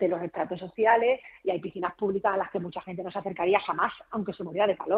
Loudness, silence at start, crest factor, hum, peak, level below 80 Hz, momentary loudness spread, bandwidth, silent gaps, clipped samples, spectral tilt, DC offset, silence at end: -28 LUFS; 0 s; 20 dB; none; -8 dBFS; -66 dBFS; 11 LU; 4.9 kHz; none; under 0.1%; -9 dB/octave; under 0.1%; 0 s